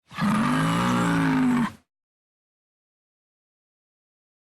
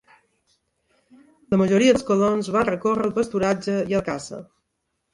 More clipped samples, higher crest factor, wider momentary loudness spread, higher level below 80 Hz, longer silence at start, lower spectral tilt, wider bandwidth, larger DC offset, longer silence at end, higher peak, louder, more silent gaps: neither; about the same, 16 dB vs 18 dB; second, 4 LU vs 12 LU; about the same, -54 dBFS vs -54 dBFS; second, 0.1 s vs 1.5 s; about the same, -6 dB/octave vs -6 dB/octave; first, 13.5 kHz vs 11.5 kHz; neither; first, 2.8 s vs 0.7 s; second, -10 dBFS vs -6 dBFS; about the same, -23 LUFS vs -21 LUFS; neither